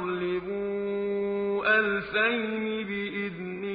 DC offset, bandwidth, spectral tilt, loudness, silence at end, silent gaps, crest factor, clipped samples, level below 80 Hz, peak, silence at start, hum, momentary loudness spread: under 0.1%; 5 kHz; -9.5 dB/octave; -28 LUFS; 0 s; none; 18 dB; under 0.1%; -62 dBFS; -10 dBFS; 0 s; none; 9 LU